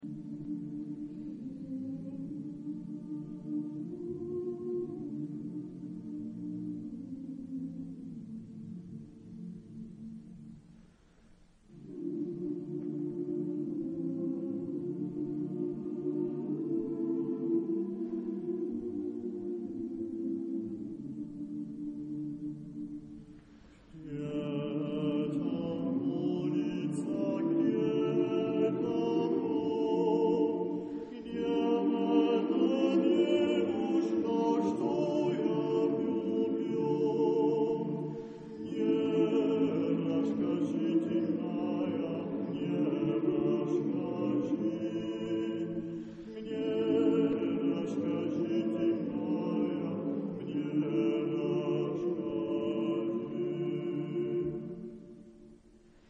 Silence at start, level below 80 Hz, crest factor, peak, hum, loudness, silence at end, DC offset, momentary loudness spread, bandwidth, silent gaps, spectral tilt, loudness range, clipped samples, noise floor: 0 s; -68 dBFS; 18 dB; -16 dBFS; none; -33 LUFS; 0.55 s; under 0.1%; 14 LU; 8.8 kHz; none; -8.5 dB/octave; 12 LU; under 0.1%; -61 dBFS